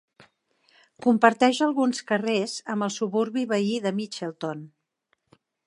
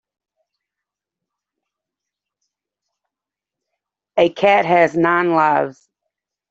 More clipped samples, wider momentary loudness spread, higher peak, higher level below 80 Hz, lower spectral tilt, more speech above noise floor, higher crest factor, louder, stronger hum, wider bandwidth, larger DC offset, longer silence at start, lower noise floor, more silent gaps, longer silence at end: neither; first, 13 LU vs 8 LU; about the same, -2 dBFS vs -2 dBFS; second, -78 dBFS vs -66 dBFS; second, -4.5 dB/octave vs -6.5 dB/octave; second, 50 dB vs 71 dB; about the same, 24 dB vs 20 dB; second, -25 LUFS vs -16 LUFS; second, none vs 50 Hz at -60 dBFS; first, 11 kHz vs 7.8 kHz; neither; second, 1 s vs 4.15 s; second, -74 dBFS vs -87 dBFS; neither; first, 1 s vs 0.8 s